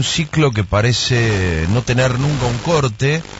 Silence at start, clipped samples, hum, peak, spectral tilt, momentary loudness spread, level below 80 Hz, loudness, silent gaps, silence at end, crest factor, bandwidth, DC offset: 0 s; under 0.1%; none; -4 dBFS; -5 dB/octave; 3 LU; -34 dBFS; -16 LUFS; none; 0 s; 12 dB; 8 kHz; under 0.1%